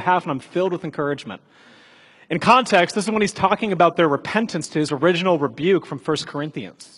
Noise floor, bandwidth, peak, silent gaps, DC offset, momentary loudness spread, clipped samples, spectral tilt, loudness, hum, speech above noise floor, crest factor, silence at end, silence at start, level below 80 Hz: -50 dBFS; 11.5 kHz; 0 dBFS; none; under 0.1%; 12 LU; under 0.1%; -5 dB/octave; -20 LUFS; none; 30 dB; 20 dB; 0.1 s; 0 s; -60 dBFS